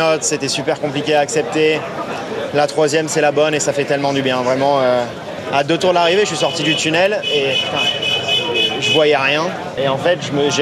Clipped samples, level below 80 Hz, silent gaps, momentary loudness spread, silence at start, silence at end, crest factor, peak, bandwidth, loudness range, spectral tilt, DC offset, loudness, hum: under 0.1%; -56 dBFS; none; 6 LU; 0 s; 0 s; 14 dB; -2 dBFS; 13.5 kHz; 2 LU; -3 dB/octave; under 0.1%; -16 LUFS; none